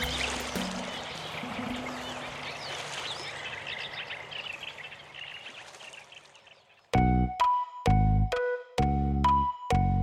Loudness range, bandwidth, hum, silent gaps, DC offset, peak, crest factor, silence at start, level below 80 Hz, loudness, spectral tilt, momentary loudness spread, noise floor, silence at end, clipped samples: 11 LU; 16 kHz; none; none; under 0.1%; -14 dBFS; 16 dB; 0 s; -38 dBFS; -30 LUFS; -5.5 dB/octave; 17 LU; -58 dBFS; 0 s; under 0.1%